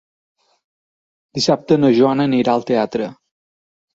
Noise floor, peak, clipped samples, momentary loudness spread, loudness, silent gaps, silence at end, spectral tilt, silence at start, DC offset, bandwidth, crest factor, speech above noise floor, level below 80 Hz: under -90 dBFS; -2 dBFS; under 0.1%; 11 LU; -16 LUFS; none; 0.8 s; -6 dB/octave; 1.35 s; under 0.1%; 8 kHz; 16 dB; over 74 dB; -60 dBFS